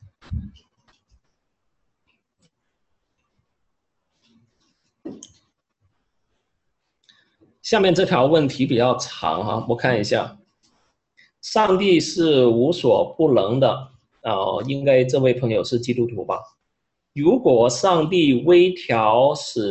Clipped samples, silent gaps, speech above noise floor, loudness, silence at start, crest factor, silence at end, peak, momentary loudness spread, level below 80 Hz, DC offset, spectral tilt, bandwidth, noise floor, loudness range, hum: under 0.1%; none; 59 dB; -19 LUFS; 0.3 s; 18 dB; 0 s; -2 dBFS; 15 LU; -50 dBFS; under 0.1%; -5.5 dB/octave; 8.6 kHz; -77 dBFS; 4 LU; none